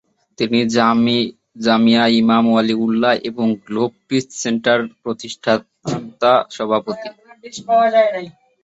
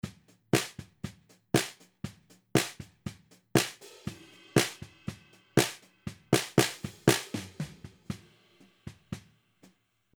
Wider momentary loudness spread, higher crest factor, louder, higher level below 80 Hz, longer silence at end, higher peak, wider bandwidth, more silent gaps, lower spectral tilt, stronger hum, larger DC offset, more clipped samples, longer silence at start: second, 13 LU vs 18 LU; second, 16 dB vs 26 dB; first, -17 LUFS vs -30 LUFS; about the same, -60 dBFS vs -62 dBFS; second, 0.35 s vs 1 s; first, 0 dBFS vs -6 dBFS; second, 8 kHz vs over 20 kHz; neither; about the same, -5 dB/octave vs -4 dB/octave; neither; neither; neither; first, 0.4 s vs 0.05 s